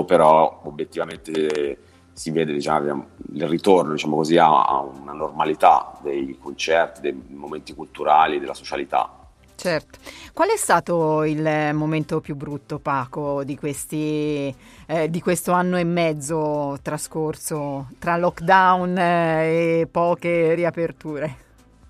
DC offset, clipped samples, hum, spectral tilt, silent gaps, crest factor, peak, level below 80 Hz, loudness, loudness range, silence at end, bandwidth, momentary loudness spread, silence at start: under 0.1%; under 0.1%; none; -5.5 dB/octave; none; 20 dB; -2 dBFS; -54 dBFS; -21 LUFS; 5 LU; 0.55 s; 15.5 kHz; 14 LU; 0 s